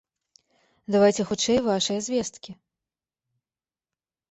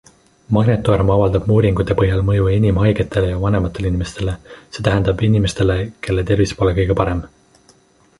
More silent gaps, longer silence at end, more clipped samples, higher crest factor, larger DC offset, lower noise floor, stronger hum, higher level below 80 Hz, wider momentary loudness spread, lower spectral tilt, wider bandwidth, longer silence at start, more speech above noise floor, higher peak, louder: neither; first, 1.8 s vs 0.95 s; neither; about the same, 20 dB vs 16 dB; neither; first, under -90 dBFS vs -52 dBFS; neither; second, -60 dBFS vs -30 dBFS; first, 23 LU vs 7 LU; second, -4 dB/octave vs -7.5 dB/octave; second, 8.4 kHz vs 11.5 kHz; first, 0.9 s vs 0.5 s; first, over 67 dB vs 36 dB; second, -8 dBFS vs -2 dBFS; second, -24 LUFS vs -17 LUFS